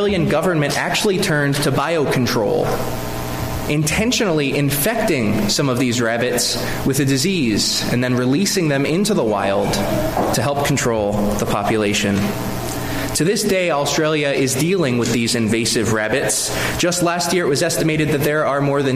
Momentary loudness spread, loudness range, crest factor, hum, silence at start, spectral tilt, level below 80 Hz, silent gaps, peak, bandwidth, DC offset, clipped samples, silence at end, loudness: 3 LU; 1 LU; 12 dB; none; 0 s; -4.5 dB/octave; -36 dBFS; none; -6 dBFS; 15.5 kHz; under 0.1%; under 0.1%; 0 s; -18 LUFS